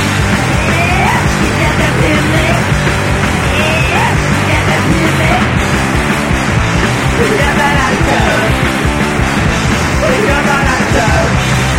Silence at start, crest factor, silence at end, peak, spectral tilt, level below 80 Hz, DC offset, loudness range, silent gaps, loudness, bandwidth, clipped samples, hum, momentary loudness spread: 0 s; 10 dB; 0 s; 0 dBFS; -5 dB/octave; -20 dBFS; under 0.1%; 0 LU; none; -11 LUFS; 16.5 kHz; under 0.1%; none; 2 LU